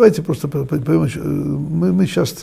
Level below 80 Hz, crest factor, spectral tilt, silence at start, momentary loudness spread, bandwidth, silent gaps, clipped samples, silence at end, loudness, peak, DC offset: -44 dBFS; 16 dB; -7 dB/octave; 0 s; 5 LU; 15.5 kHz; none; under 0.1%; 0 s; -18 LUFS; 0 dBFS; under 0.1%